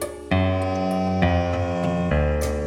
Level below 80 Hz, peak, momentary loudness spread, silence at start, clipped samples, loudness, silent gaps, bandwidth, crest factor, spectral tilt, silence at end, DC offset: -34 dBFS; -8 dBFS; 3 LU; 0 s; under 0.1%; -23 LUFS; none; 16 kHz; 14 dB; -7 dB/octave; 0 s; under 0.1%